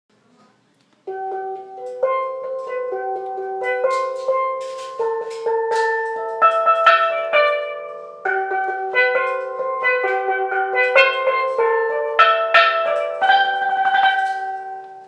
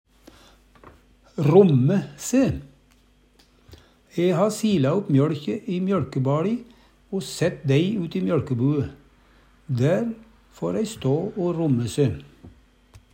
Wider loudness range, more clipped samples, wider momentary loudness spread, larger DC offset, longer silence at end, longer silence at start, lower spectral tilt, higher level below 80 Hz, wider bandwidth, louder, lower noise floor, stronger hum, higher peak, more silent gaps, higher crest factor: first, 8 LU vs 3 LU; neither; about the same, 14 LU vs 12 LU; neither; second, 0 s vs 0.15 s; first, 1.05 s vs 0.85 s; second, -1.5 dB/octave vs -7 dB/octave; second, -78 dBFS vs -54 dBFS; second, 10.5 kHz vs 16 kHz; first, -18 LUFS vs -23 LUFS; about the same, -59 dBFS vs -58 dBFS; neither; about the same, 0 dBFS vs -2 dBFS; neither; about the same, 18 dB vs 20 dB